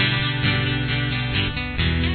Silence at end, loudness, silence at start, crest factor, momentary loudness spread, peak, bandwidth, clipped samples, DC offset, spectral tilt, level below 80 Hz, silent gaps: 0 s; -22 LUFS; 0 s; 18 dB; 3 LU; -4 dBFS; 4.6 kHz; under 0.1%; under 0.1%; -8.5 dB/octave; -32 dBFS; none